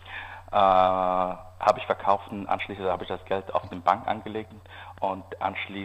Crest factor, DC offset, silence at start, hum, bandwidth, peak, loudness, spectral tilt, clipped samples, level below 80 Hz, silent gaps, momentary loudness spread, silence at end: 20 dB; under 0.1%; 0 s; none; 8.8 kHz; -6 dBFS; -26 LUFS; -6 dB/octave; under 0.1%; -54 dBFS; none; 16 LU; 0 s